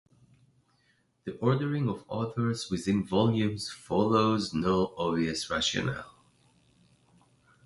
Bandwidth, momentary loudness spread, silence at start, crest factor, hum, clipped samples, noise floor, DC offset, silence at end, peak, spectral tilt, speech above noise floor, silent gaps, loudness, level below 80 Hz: 11.5 kHz; 9 LU; 1.25 s; 20 dB; none; under 0.1%; -70 dBFS; under 0.1%; 1.6 s; -10 dBFS; -5.5 dB/octave; 42 dB; none; -29 LUFS; -56 dBFS